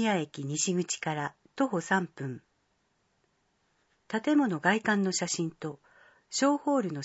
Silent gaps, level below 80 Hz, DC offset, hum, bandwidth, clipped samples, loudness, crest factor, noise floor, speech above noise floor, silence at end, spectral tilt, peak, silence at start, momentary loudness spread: none; -78 dBFS; under 0.1%; none; 8.2 kHz; under 0.1%; -30 LUFS; 22 dB; -74 dBFS; 45 dB; 0 s; -4 dB/octave; -10 dBFS; 0 s; 12 LU